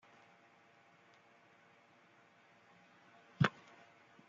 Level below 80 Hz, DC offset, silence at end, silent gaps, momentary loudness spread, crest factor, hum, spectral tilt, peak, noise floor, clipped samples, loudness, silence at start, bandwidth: -76 dBFS; under 0.1%; 0.8 s; none; 30 LU; 32 dB; none; -5 dB/octave; -16 dBFS; -67 dBFS; under 0.1%; -36 LUFS; 3.4 s; 7.6 kHz